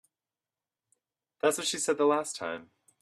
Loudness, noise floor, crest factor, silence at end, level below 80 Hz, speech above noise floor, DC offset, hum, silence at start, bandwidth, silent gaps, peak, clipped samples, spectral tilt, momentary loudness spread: -29 LUFS; under -90 dBFS; 22 dB; 0.4 s; -80 dBFS; over 61 dB; under 0.1%; none; 1.45 s; 14 kHz; none; -10 dBFS; under 0.1%; -2 dB/octave; 11 LU